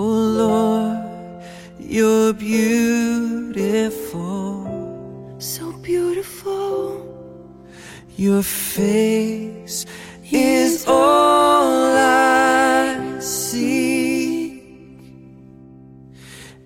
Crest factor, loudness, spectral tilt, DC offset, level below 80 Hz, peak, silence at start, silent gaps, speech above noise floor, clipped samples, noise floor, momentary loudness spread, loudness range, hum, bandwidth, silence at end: 16 dB; -18 LUFS; -4.5 dB/octave; under 0.1%; -52 dBFS; -2 dBFS; 0 s; none; 26 dB; under 0.1%; -42 dBFS; 21 LU; 10 LU; none; 16.5 kHz; 0.15 s